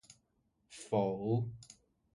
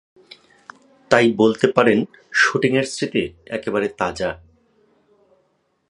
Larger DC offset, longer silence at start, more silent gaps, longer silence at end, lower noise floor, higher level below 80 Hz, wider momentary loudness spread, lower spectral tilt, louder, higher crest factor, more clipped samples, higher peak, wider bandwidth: neither; second, 0.1 s vs 1.1 s; neither; second, 0.45 s vs 1.55 s; first, -78 dBFS vs -66 dBFS; second, -68 dBFS vs -54 dBFS; first, 21 LU vs 11 LU; first, -7.5 dB/octave vs -5 dB/octave; second, -36 LUFS vs -19 LUFS; about the same, 18 dB vs 20 dB; neither; second, -20 dBFS vs 0 dBFS; about the same, 11.5 kHz vs 11 kHz